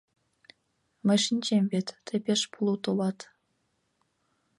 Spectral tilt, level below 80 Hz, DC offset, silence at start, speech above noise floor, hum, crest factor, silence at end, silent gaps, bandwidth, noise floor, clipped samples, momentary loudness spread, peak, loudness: -4.5 dB/octave; -76 dBFS; under 0.1%; 1.05 s; 48 dB; none; 18 dB; 1.35 s; none; 11.5 kHz; -75 dBFS; under 0.1%; 8 LU; -12 dBFS; -28 LUFS